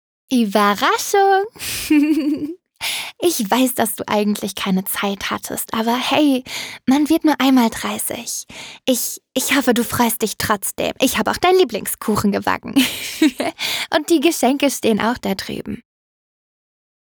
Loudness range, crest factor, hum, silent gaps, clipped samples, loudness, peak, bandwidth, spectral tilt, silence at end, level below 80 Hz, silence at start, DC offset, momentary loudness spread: 2 LU; 14 dB; none; none; under 0.1%; -18 LUFS; -4 dBFS; over 20 kHz; -3.5 dB/octave; 1.35 s; -52 dBFS; 0.3 s; under 0.1%; 9 LU